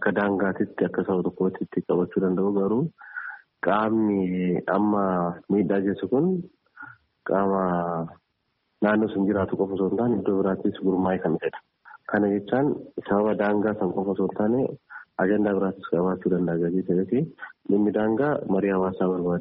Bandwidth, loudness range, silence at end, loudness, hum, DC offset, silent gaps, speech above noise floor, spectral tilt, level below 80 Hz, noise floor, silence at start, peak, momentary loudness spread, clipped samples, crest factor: 4 kHz; 2 LU; 0 s; -25 LUFS; none; under 0.1%; none; 51 dB; -7.5 dB/octave; -62 dBFS; -74 dBFS; 0 s; -8 dBFS; 10 LU; under 0.1%; 16 dB